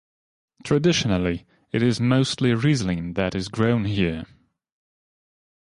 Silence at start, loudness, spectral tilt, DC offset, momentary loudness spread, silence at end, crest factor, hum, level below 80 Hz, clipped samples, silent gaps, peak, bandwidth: 0.65 s; -22 LUFS; -6 dB/octave; under 0.1%; 8 LU; 1.4 s; 16 dB; none; -46 dBFS; under 0.1%; none; -8 dBFS; 11.5 kHz